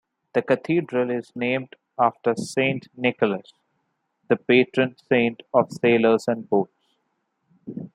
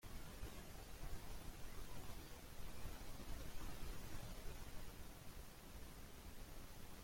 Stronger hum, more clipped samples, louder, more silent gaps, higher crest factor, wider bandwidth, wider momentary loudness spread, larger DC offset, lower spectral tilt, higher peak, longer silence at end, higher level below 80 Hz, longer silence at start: neither; neither; first, -23 LUFS vs -56 LUFS; neither; first, 20 dB vs 14 dB; second, 11.5 kHz vs 16.5 kHz; first, 9 LU vs 4 LU; neither; first, -6 dB/octave vs -4 dB/octave; first, -4 dBFS vs -36 dBFS; about the same, 0.05 s vs 0 s; second, -70 dBFS vs -56 dBFS; first, 0.35 s vs 0.05 s